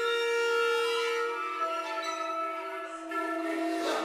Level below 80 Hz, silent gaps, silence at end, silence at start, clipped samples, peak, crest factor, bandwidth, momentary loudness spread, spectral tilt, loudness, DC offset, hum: -82 dBFS; none; 0 s; 0 s; under 0.1%; -18 dBFS; 12 dB; 15.5 kHz; 8 LU; 0 dB/octave; -31 LUFS; under 0.1%; none